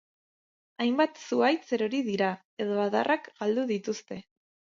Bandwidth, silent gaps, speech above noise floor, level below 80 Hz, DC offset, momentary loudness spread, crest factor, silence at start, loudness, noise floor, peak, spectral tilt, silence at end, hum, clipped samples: 7.6 kHz; 2.45-2.57 s; over 62 dB; -78 dBFS; under 0.1%; 9 LU; 18 dB; 0.8 s; -29 LUFS; under -90 dBFS; -10 dBFS; -5 dB/octave; 0.55 s; none; under 0.1%